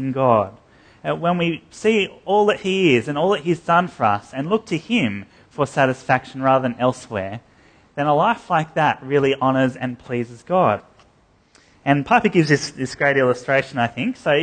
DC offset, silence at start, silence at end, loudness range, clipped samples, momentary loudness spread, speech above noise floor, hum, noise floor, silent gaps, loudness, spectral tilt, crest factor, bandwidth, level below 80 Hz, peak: under 0.1%; 0 s; 0 s; 2 LU; under 0.1%; 10 LU; 37 dB; none; -56 dBFS; none; -20 LUFS; -6 dB/octave; 18 dB; 9.8 kHz; -56 dBFS; -2 dBFS